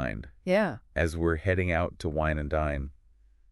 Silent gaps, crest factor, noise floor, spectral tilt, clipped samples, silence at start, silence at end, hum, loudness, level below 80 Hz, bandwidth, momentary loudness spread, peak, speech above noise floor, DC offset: none; 18 dB; -59 dBFS; -7 dB/octave; under 0.1%; 0 s; 0.6 s; none; -29 LUFS; -40 dBFS; 12 kHz; 9 LU; -12 dBFS; 31 dB; under 0.1%